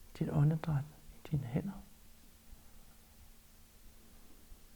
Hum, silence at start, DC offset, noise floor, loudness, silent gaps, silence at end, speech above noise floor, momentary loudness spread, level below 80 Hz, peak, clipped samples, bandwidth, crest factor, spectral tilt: none; 0 s; under 0.1%; -59 dBFS; -36 LUFS; none; 0 s; 25 dB; 28 LU; -58 dBFS; -22 dBFS; under 0.1%; 20 kHz; 18 dB; -8.5 dB/octave